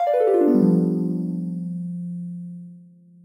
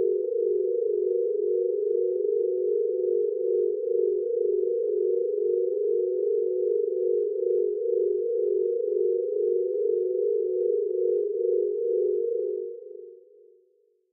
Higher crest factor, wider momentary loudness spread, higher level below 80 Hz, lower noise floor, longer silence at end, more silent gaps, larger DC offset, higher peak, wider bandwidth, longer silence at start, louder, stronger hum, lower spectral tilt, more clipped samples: about the same, 16 dB vs 12 dB; first, 18 LU vs 1 LU; first, -74 dBFS vs under -90 dBFS; second, -48 dBFS vs -66 dBFS; second, 0.4 s vs 0.95 s; neither; neither; first, -6 dBFS vs -14 dBFS; first, 9.6 kHz vs 0.6 kHz; about the same, 0 s vs 0 s; first, -22 LUFS vs -26 LUFS; neither; first, -10.5 dB/octave vs -2 dB/octave; neither